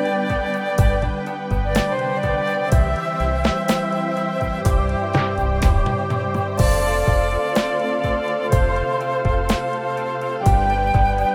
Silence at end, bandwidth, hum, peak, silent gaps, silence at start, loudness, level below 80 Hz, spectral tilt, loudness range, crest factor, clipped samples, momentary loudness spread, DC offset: 0 s; 17 kHz; none; -2 dBFS; none; 0 s; -20 LUFS; -24 dBFS; -6.5 dB/octave; 1 LU; 16 dB; under 0.1%; 5 LU; under 0.1%